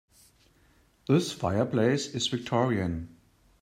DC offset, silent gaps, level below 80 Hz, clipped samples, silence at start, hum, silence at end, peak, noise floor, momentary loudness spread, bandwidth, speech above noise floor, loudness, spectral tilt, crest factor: under 0.1%; none; -58 dBFS; under 0.1%; 1.1 s; none; 0.55 s; -10 dBFS; -63 dBFS; 11 LU; 15.5 kHz; 36 dB; -28 LUFS; -5.5 dB/octave; 18 dB